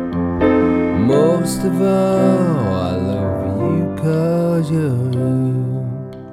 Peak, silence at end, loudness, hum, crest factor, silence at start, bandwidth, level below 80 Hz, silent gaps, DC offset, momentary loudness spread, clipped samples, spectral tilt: -2 dBFS; 0 s; -17 LUFS; none; 14 dB; 0 s; 15 kHz; -42 dBFS; none; under 0.1%; 6 LU; under 0.1%; -8 dB/octave